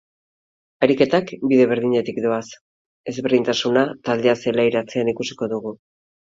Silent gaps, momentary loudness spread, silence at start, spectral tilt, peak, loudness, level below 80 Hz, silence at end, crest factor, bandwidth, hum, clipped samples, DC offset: 2.61-3.04 s; 10 LU; 0.8 s; -5.5 dB/octave; 0 dBFS; -20 LUFS; -62 dBFS; 0.55 s; 20 dB; 7.8 kHz; none; under 0.1%; under 0.1%